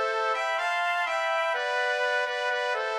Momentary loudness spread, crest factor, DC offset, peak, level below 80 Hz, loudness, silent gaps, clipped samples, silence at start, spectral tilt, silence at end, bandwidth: 1 LU; 12 dB; under 0.1%; -16 dBFS; -82 dBFS; -26 LUFS; none; under 0.1%; 0 s; 2.5 dB/octave; 0 s; 13.5 kHz